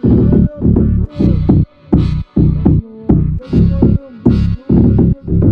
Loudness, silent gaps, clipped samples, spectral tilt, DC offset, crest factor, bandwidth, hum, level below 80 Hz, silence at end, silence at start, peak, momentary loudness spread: -13 LUFS; none; under 0.1%; -11.5 dB/octave; under 0.1%; 10 dB; 5.2 kHz; none; -20 dBFS; 0 s; 0.05 s; 0 dBFS; 4 LU